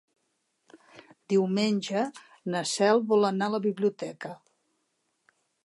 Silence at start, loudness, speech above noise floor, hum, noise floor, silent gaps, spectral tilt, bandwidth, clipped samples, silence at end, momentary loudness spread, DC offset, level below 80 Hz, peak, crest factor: 0.95 s; -27 LUFS; 50 dB; none; -76 dBFS; none; -5 dB/octave; 11.5 kHz; under 0.1%; 1.3 s; 14 LU; under 0.1%; -82 dBFS; -10 dBFS; 18 dB